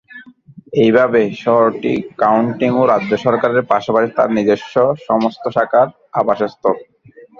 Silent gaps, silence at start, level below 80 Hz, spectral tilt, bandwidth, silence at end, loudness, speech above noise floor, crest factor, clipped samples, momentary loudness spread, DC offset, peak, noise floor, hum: none; 0.15 s; -56 dBFS; -7.5 dB/octave; 7.2 kHz; 0.55 s; -15 LUFS; 27 dB; 14 dB; under 0.1%; 6 LU; under 0.1%; 0 dBFS; -42 dBFS; none